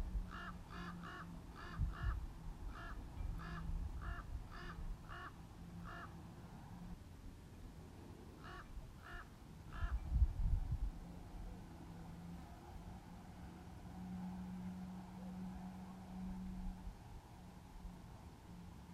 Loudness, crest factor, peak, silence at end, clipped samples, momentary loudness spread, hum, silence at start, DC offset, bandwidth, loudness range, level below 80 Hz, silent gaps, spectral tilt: -50 LUFS; 24 dB; -22 dBFS; 0 s; under 0.1%; 13 LU; none; 0 s; under 0.1%; 15 kHz; 9 LU; -48 dBFS; none; -7 dB/octave